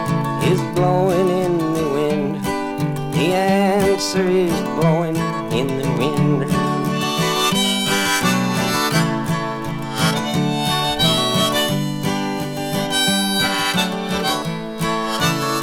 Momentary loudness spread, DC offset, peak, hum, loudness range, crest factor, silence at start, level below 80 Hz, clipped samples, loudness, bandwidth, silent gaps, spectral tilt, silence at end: 6 LU; under 0.1%; -4 dBFS; none; 1 LU; 14 dB; 0 s; -46 dBFS; under 0.1%; -18 LUFS; 18 kHz; none; -4.5 dB/octave; 0 s